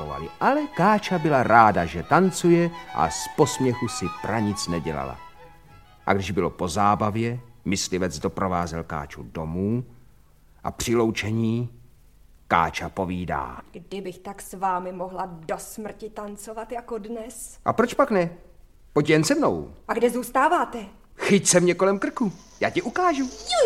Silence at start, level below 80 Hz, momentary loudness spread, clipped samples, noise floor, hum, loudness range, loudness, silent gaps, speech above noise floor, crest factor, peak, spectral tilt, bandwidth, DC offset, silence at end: 0 s; -50 dBFS; 16 LU; under 0.1%; -55 dBFS; none; 10 LU; -24 LUFS; none; 31 dB; 24 dB; -2 dBFS; -5 dB/octave; 16 kHz; 0.2%; 0 s